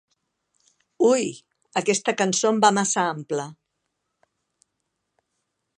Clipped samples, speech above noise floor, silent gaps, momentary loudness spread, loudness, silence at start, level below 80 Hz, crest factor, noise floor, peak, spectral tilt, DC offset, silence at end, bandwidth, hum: under 0.1%; 57 dB; none; 11 LU; -22 LUFS; 1 s; -78 dBFS; 24 dB; -78 dBFS; -2 dBFS; -3.5 dB/octave; under 0.1%; 2.25 s; 11.5 kHz; none